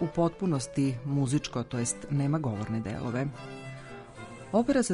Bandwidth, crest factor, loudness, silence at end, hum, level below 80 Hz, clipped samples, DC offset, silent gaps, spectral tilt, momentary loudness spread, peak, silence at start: 11 kHz; 16 dB; -30 LUFS; 0 s; none; -56 dBFS; under 0.1%; under 0.1%; none; -6 dB/octave; 15 LU; -14 dBFS; 0 s